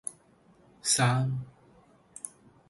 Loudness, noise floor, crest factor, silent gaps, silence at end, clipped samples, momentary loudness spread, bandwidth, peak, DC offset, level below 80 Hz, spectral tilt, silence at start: -28 LUFS; -61 dBFS; 22 dB; none; 0.4 s; under 0.1%; 22 LU; 12 kHz; -12 dBFS; under 0.1%; -66 dBFS; -3.5 dB/octave; 0.05 s